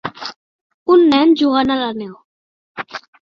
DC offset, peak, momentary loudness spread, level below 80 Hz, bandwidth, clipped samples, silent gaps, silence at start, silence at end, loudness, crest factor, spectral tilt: under 0.1%; -2 dBFS; 20 LU; -56 dBFS; 7 kHz; under 0.1%; 0.36-0.86 s, 2.24-2.75 s; 0.05 s; 0.25 s; -14 LUFS; 16 dB; -5.5 dB/octave